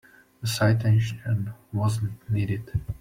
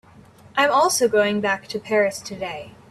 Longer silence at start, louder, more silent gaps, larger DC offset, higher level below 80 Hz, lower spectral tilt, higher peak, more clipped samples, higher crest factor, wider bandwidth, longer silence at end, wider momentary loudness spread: second, 0.4 s vs 0.55 s; second, -26 LUFS vs -21 LUFS; neither; neither; first, -48 dBFS vs -60 dBFS; first, -6 dB/octave vs -3 dB/octave; second, -10 dBFS vs -4 dBFS; neither; about the same, 16 dB vs 18 dB; first, 16 kHz vs 14.5 kHz; second, 0.05 s vs 0.2 s; second, 9 LU vs 13 LU